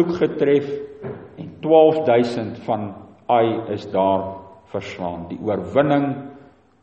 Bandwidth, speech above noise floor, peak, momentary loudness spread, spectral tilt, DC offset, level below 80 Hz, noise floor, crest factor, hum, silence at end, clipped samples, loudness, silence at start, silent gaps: 8.4 kHz; 28 dB; -2 dBFS; 19 LU; -8 dB/octave; under 0.1%; -58 dBFS; -47 dBFS; 18 dB; none; 0.45 s; under 0.1%; -20 LUFS; 0 s; none